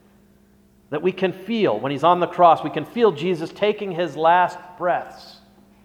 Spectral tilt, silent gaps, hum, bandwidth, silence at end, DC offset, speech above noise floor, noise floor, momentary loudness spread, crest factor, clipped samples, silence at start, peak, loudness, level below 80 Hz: -6.5 dB/octave; none; none; 14.5 kHz; 0.55 s; under 0.1%; 35 dB; -55 dBFS; 10 LU; 20 dB; under 0.1%; 0.9 s; -2 dBFS; -20 LUFS; -64 dBFS